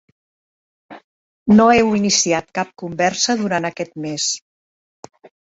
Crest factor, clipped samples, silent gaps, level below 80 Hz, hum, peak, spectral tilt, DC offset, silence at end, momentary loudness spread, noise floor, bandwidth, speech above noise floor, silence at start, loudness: 18 dB; under 0.1%; 1.04-1.46 s; -54 dBFS; none; -2 dBFS; -3.5 dB/octave; under 0.1%; 1.05 s; 14 LU; under -90 dBFS; 8 kHz; over 73 dB; 0.9 s; -17 LUFS